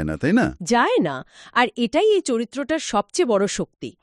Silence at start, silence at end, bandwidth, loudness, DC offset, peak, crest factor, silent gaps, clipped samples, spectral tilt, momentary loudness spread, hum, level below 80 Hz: 0 s; 0.1 s; 11.5 kHz; -21 LUFS; under 0.1%; -4 dBFS; 18 dB; none; under 0.1%; -4.5 dB/octave; 7 LU; none; -48 dBFS